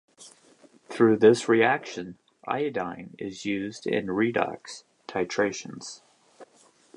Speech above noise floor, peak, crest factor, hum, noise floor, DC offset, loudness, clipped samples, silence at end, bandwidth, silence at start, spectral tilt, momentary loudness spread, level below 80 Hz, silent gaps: 35 dB; -6 dBFS; 22 dB; none; -60 dBFS; under 0.1%; -25 LUFS; under 0.1%; 0.5 s; 11 kHz; 0.2 s; -5 dB/octave; 22 LU; -68 dBFS; none